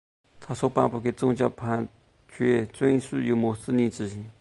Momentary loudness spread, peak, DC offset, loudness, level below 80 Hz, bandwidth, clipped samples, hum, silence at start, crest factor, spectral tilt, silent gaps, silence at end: 8 LU; -6 dBFS; under 0.1%; -26 LUFS; -58 dBFS; 11.5 kHz; under 0.1%; none; 0.4 s; 20 dB; -7 dB/octave; none; 0.1 s